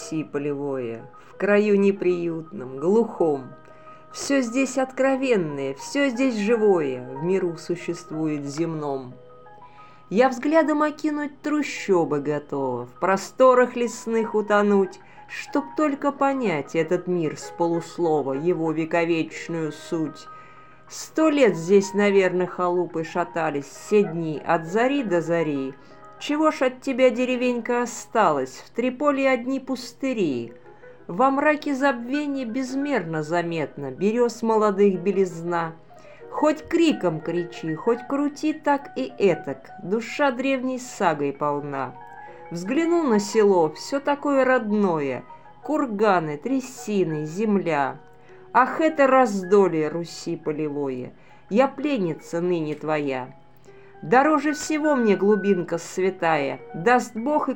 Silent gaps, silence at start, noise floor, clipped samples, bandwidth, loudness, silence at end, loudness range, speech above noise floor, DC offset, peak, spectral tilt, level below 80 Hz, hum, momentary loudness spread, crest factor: none; 0 s; -50 dBFS; under 0.1%; 17 kHz; -23 LUFS; 0 s; 3 LU; 27 dB; 0.3%; -4 dBFS; -5.5 dB/octave; -66 dBFS; none; 11 LU; 18 dB